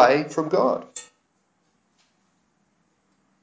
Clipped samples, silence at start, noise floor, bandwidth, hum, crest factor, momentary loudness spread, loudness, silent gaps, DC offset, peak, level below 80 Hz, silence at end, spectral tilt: under 0.1%; 0 s; -69 dBFS; 8 kHz; none; 22 dB; 18 LU; -22 LUFS; none; under 0.1%; -2 dBFS; -72 dBFS; 2.4 s; -5 dB/octave